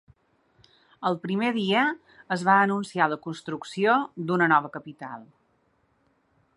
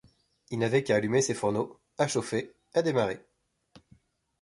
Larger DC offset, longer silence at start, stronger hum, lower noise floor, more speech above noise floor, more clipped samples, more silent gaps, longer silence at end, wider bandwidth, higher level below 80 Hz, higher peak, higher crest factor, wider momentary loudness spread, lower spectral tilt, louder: neither; first, 1 s vs 0.5 s; neither; first, -68 dBFS vs -63 dBFS; first, 43 dB vs 36 dB; neither; neither; about the same, 1.35 s vs 1.25 s; about the same, 11.5 kHz vs 11.5 kHz; second, -72 dBFS vs -66 dBFS; first, -6 dBFS vs -12 dBFS; about the same, 20 dB vs 18 dB; first, 18 LU vs 9 LU; about the same, -6 dB/octave vs -5 dB/octave; first, -25 LUFS vs -29 LUFS